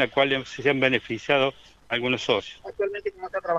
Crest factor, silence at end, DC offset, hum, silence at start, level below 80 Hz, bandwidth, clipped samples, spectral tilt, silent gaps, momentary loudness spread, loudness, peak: 20 dB; 0 s; under 0.1%; none; 0 s; -60 dBFS; 8.6 kHz; under 0.1%; -5 dB/octave; none; 9 LU; -25 LUFS; -6 dBFS